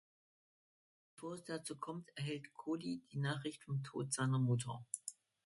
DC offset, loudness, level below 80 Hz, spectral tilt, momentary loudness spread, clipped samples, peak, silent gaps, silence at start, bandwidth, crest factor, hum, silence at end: under 0.1%; -42 LUFS; -80 dBFS; -5 dB/octave; 11 LU; under 0.1%; -24 dBFS; none; 1.2 s; 11.5 kHz; 20 dB; none; 0.35 s